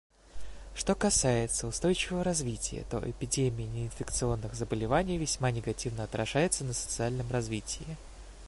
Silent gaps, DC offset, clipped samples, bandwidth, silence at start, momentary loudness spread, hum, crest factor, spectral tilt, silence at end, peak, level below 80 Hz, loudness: none; under 0.1%; under 0.1%; 11.5 kHz; 0.25 s; 10 LU; none; 18 dB; -4 dB/octave; 0 s; -14 dBFS; -46 dBFS; -31 LUFS